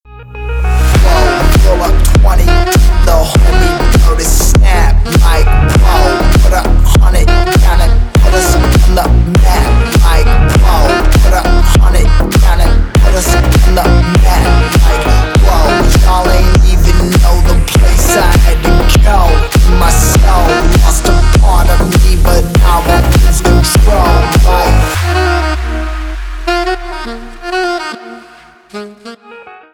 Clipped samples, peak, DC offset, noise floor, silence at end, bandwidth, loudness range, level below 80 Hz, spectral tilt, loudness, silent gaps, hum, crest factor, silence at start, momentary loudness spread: under 0.1%; 0 dBFS; under 0.1%; -38 dBFS; 0.25 s; 18 kHz; 3 LU; -8 dBFS; -5 dB/octave; -9 LUFS; none; none; 6 dB; 0.15 s; 7 LU